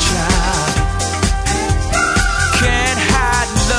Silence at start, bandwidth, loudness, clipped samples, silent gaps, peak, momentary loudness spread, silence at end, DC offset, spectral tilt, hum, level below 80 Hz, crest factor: 0 s; 11 kHz; -15 LUFS; under 0.1%; none; 0 dBFS; 4 LU; 0 s; under 0.1%; -3.5 dB/octave; none; -20 dBFS; 14 dB